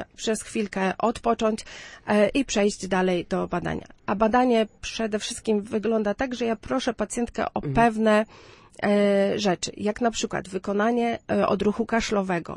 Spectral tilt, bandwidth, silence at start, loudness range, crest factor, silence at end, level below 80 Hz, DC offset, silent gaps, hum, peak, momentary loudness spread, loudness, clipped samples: -5 dB/octave; 11.5 kHz; 0 s; 1 LU; 18 dB; 0 s; -48 dBFS; under 0.1%; none; none; -6 dBFS; 8 LU; -25 LUFS; under 0.1%